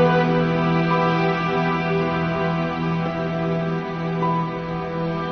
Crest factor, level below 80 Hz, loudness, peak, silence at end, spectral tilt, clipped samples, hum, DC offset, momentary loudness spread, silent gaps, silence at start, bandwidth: 16 dB; -48 dBFS; -22 LUFS; -6 dBFS; 0 s; -8 dB/octave; under 0.1%; none; under 0.1%; 7 LU; none; 0 s; 6.4 kHz